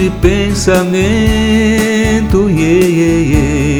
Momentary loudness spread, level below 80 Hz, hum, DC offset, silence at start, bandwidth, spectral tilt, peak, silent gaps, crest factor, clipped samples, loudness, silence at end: 2 LU; -20 dBFS; none; under 0.1%; 0 s; over 20 kHz; -6 dB/octave; 0 dBFS; none; 10 dB; 0.2%; -11 LUFS; 0 s